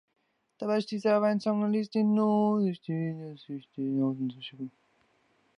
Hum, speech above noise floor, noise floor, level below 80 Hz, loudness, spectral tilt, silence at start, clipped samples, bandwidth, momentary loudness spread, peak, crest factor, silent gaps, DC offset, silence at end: none; 41 dB; -69 dBFS; -80 dBFS; -29 LUFS; -8 dB/octave; 0.6 s; under 0.1%; 10 kHz; 16 LU; -14 dBFS; 16 dB; none; under 0.1%; 0.9 s